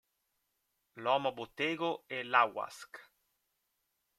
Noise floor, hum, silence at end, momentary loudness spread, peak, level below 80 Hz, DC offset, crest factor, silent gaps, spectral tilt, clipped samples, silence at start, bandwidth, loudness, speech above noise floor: -82 dBFS; none; 1.15 s; 19 LU; -12 dBFS; -82 dBFS; under 0.1%; 26 dB; none; -4 dB/octave; under 0.1%; 0.95 s; 14.5 kHz; -34 LUFS; 48 dB